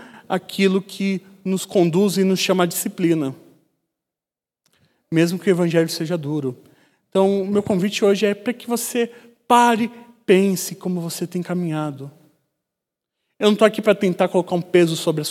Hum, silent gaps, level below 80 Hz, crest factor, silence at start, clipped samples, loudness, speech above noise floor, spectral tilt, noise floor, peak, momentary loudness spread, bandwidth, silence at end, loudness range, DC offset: none; none; -70 dBFS; 20 dB; 0 s; under 0.1%; -20 LUFS; 71 dB; -5.5 dB/octave; -90 dBFS; 0 dBFS; 10 LU; 16 kHz; 0 s; 4 LU; under 0.1%